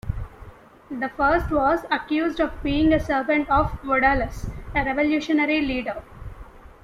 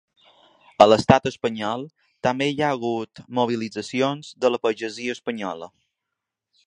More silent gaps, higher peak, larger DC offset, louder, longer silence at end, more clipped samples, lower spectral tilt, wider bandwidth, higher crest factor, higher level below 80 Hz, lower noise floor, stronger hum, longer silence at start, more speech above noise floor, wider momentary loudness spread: neither; second, -6 dBFS vs 0 dBFS; neither; about the same, -22 LUFS vs -22 LUFS; second, 0.15 s vs 1 s; neither; about the same, -6.5 dB/octave vs -5.5 dB/octave; first, 13.5 kHz vs 10.5 kHz; second, 18 dB vs 24 dB; first, -36 dBFS vs -54 dBFS; second, -45 dBFS vs -84 dBFS; neither; second, 0.05 s vs 0.8 s; second, 23 dB vs 62 dB; about the same, 16 LU vs 15 LU